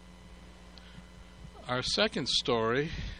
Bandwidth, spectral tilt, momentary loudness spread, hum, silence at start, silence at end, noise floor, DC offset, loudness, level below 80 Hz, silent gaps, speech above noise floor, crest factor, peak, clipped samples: 11 kHz; -3.5 dB/octave; 24 LU; none; 0 s; 0 s; -51 dBFS; under 0.1%; -29 LUFS; -50 dBFS; none; 21 dB; 22 dB; -12 dBFS; under 0.1%